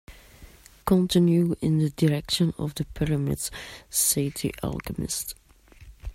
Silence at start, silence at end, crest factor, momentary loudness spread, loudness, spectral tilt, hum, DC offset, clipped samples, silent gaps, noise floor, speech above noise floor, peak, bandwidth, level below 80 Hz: 0.1 s; 0 s; 16 dB; 12 LU; -25 LUFS; -5 dB/octave; none; under 0.1%; under 0.1%; none; -50 dBFS; 25 dB; -10 dBFS; 16 kHz; -46 dBFS